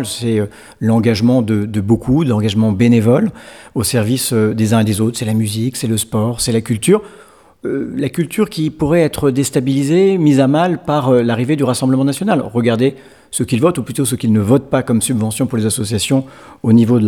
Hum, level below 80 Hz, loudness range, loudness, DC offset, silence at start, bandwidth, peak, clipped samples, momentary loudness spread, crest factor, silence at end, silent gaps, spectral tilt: none; -44 dBFS; 3 LU; -15 LUFS; 0.1%; 0 s; 18 kHz; 0 dBFS; under 0.1%; 7 LU; 14 dB; 0 s; none; -6 dB/octave